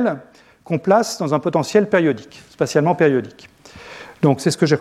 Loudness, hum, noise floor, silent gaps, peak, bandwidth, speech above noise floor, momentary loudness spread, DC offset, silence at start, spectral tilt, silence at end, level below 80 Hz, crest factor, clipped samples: -18 LUFS; none; -39 dBFS; none; -2 dBFS; 14 kHz; 21 dB; 17 LU; under 0.1%; 0 s; -6 dB/octave; 0 s; -62 dBFS; 16 dB; under 0.1%